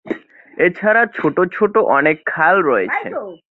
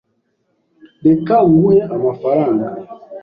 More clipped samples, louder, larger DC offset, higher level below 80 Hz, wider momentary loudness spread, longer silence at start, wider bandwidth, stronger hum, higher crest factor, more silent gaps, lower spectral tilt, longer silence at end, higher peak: neither; about the same, -15 LUFS vs -14 LUFS; neither; second, -60 dBFS vs -52 dBFS; about the same, 15 LU vs 14 LU; second, 0.05 s vs 1.05 s; second, 4.2 kHz vs 5 kHz; neither; about the same, 16 dB vs 12 dB; neither; second, -8.5 dB/octave vs -12 dB/octave; first, 0.15 s vs 0 s; about the same, -2 dBFS vs -2 dBFS